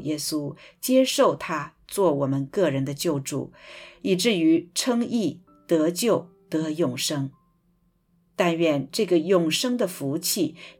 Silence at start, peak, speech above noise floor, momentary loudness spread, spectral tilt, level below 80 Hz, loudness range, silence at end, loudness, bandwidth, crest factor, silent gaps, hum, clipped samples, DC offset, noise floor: 0 s; -8 dBFS; 42 dB; 12 LU; -4.5 dB/octave; -66 dBFS; 2 LU; 0.1 s; -24 LUFS; 19 kHz; 16 dB; none; none; under 0.1%; under 0.1%; -66 dBFS